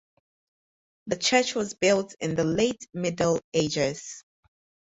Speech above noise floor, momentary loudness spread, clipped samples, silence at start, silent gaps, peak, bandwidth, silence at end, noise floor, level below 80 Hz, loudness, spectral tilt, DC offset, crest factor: over 64 dB; 14 LU; under 0.1%; 1.05 s; 3.44-3.52 s; -6 dBFS; 8.2 kHz; 0.65 s; under -90 dBFS; -60 dBFS; -26 LUFS; -4 dB/octave; under 0.1%; 22 dB